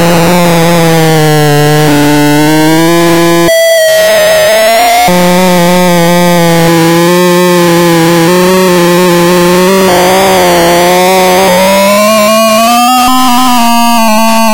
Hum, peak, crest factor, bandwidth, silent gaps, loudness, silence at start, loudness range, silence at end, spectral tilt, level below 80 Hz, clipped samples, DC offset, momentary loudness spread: none; 0 dBFS; 6 dB; 17 kHz; none; -5 LUFS; 0 s; 1 LU; 0 s; -4.5 dB/octave; -36 dBFS; under 0.1%; under 0.1%; 1 LU